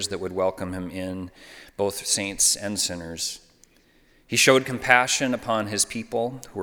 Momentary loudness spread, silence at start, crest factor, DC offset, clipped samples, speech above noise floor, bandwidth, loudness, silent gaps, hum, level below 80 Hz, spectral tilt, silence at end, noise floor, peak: 14 LU; 0 s; 26 dB; under 0.1%; under 0.1%; 34 dB; over 20 kHz; -23 LUFS; none; none; -56 dBFS; -2 dB/octave; 0 s; -59 dBFS; 0 dBFS